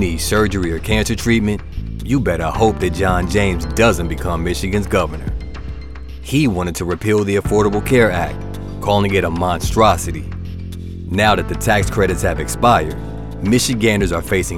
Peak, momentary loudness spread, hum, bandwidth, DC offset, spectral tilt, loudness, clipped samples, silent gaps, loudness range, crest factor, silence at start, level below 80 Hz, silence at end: 0 dBFS; 14 LU; none; 17 kHz; 2%; -5.5 dB/octave; -17 LUFS; under 0.1%; none; 3 LU; 16 dB; 0 s; -28 dBFS; 0 s